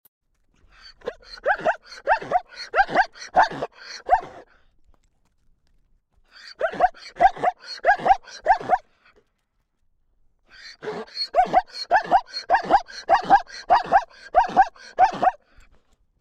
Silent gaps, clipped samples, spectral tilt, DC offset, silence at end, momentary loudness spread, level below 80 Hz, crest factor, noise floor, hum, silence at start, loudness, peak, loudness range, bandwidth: none; under 0.1%; -3.5 dB/octave; under 0.1%; 0.85 s; 15 LU; -50 dBFS; 20 dB; -72 dBFS; none; 0.85 s; -22 LUFS; -4 dBFS; 7 LU; 9 kHz